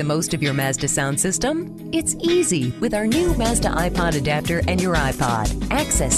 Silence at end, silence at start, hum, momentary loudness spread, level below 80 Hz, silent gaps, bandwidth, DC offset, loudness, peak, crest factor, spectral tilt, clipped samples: 0 s; 0 s; none; 3 LU; -30 dBFS; none; 13 kHz; under 0.1%; -20 LUFS; -6 dBFS; 14 dB; -4 dB/octave; under 0.1%